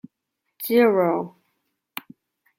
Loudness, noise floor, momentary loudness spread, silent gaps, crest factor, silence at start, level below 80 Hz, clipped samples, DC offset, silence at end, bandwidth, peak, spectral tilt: -20 LUFS; -79 dBFS; 20 LU; none; 18 dB; 0.6 s; -74 dBFS; under 0.1%; under 0.1%; 1.3 s; 16.5 kHz; -6 dBFS; -6 dB/octave